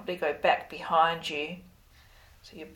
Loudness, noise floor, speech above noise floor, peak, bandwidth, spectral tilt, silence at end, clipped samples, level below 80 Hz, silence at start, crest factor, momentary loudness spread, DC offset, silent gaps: -28 LUFS; -57 dBFS; 28 dB; -8 dBFS; 17.5 kHz; -4 dB/octave; 0 s; under 0.1%; -62 dBFS; 0 s; 22 dB; 16 LU; under 0.1%; none